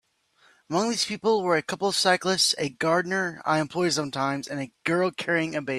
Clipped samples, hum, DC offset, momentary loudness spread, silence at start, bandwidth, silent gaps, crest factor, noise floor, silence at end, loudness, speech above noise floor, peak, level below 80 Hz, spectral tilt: under 0.1%; none; under 0.1%; 6 LU; 0.7 s; 14.5 kHz; none; 20 dB; -62 dBFS; 0 s; -25 LUFS; 37 dB; -6 dBFS; -68 dBFS; -3.5 dB/octave